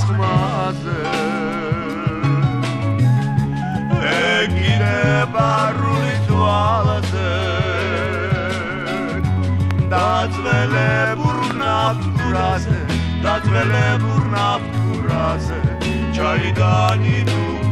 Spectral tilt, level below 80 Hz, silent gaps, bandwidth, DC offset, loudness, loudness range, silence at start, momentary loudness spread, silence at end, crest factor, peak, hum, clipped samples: -6.5 dB/octave; -34 dBFS; none; 11.5 kHz; 0.1%; -18 LUFS; 2 LU; 0 s; 5 LU; 0 s; 16 dB; -2 dBFS; none; under 0.1%